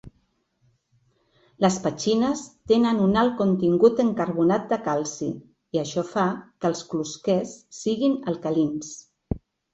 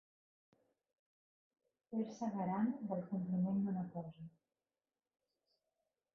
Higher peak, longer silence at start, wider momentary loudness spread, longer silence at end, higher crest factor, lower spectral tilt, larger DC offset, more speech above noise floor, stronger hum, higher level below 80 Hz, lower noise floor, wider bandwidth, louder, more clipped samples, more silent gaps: first, -6 dBFS vs -28 dBFS; second, 0.05 s vs 1.9 s; about the same, 15 LU vs 13 LU; second, 0.35 s vs 1.85 s; about the same, 20 dB vs 16 dB; second, -6 dB/octave vs -9.5 dB/octave; neither; second, 46 dB vs over 50 dB; neither; first, -52 dBFS vs -84 dBFS; second, -69 dBFS vs under -90 dBFS; first, 8.2 kHz vs 5.6 kHz; first, -24 LUFS vs -41 LUFS; neither; neither